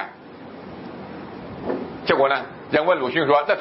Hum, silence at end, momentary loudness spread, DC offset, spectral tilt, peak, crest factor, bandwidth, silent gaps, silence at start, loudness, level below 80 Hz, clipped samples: none; 0 s; 19 LU; under 0.1%; -9.5 dB/octave; -2 dBFS; 20 dB; 5.8 kHz; none; 0 s; -21 LUFS; -58 dBFS; under 0.1%